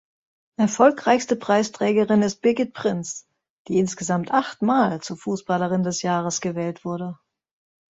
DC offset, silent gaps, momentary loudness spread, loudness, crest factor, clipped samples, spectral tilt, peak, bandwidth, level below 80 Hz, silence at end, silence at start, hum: under 0.1%; 3.50-3.65 s; 12 LU; -22 LUFS; 20 dB; under 0.1%; -5 dB/octave; -2 dBFS; 8 kHz; -64 dBFS; 0.75 s; 0.6 s; none